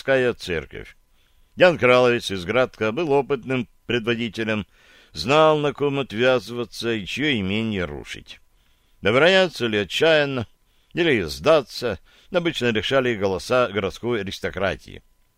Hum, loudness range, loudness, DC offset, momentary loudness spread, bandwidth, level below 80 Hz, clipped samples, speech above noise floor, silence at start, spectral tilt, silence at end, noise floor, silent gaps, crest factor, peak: none; 3 LU; -21 LUFS; under 0.1%; 14 LU; 16 kHz; -50 dBFS; under 0.1%; 38 dB; 0.05 s; -5 dB/octave; 0.4 s; -59 dBFS; none; 20 dB; -2 dBFS